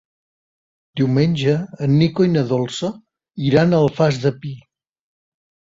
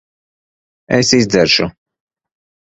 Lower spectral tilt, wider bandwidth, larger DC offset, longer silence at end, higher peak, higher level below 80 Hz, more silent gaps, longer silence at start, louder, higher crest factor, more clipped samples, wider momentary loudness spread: first, -7.5 dB/octave vs -3.5 dB/octave; about the same, 7.8 kHz vs 8.2 kHz; neither; first, 1.15 s vs 1 s; about the same, -2 dBFS vs 0 dBFS; second, -54 dBFS vs -46 dBFS; neither; about the same, 0.95 s vs 0.9 s; second, -18 LUFS vs -13 LUFS; about the same, 18 dB vs 18 dB; neither; first, 17 LU vs 6 LU